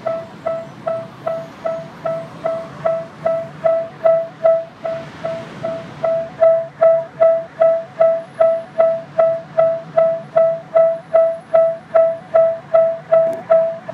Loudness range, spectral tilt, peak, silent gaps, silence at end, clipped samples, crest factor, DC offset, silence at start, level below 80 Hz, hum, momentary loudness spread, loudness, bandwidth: 6 LU; -7 dB/octave; -2 dBFS; none; 0 s; under 0.1%; 16 dB; under 0.1%; 0 s; -62 dBFS; none; 11 LU; -18 LUFS; 5.8 kHz